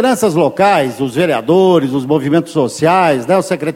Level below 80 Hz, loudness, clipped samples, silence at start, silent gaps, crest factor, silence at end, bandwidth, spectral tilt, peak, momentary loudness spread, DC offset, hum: -54 dBFS; -13 LUFS; under 0.1%; 0 s; none; 12 dB; 0 s; 16.5 kHz; -6 dB/octave; 0 dBFS; 4 LU; under 0.1%; none